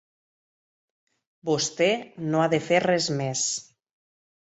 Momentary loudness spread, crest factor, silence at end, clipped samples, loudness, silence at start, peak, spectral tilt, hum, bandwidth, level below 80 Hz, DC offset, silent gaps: 7 LU; 20 dB; 0.8 s; under 0.1%; -24 LUFS; 1.45 s; -8 dBFS; -3.5 dB/octave; none; 8.4 kHz; -68 dBFS; under 0.1%; none